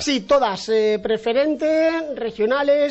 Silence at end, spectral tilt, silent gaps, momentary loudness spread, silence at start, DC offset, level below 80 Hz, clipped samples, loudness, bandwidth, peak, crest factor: 0 s; -4 dB/octave; none; 5 LU; 0 s; under 0.1%; -54 dBFS; under 0.1%; -20 LUFS; 8.4 kHz; -6 dBFS; 12 dB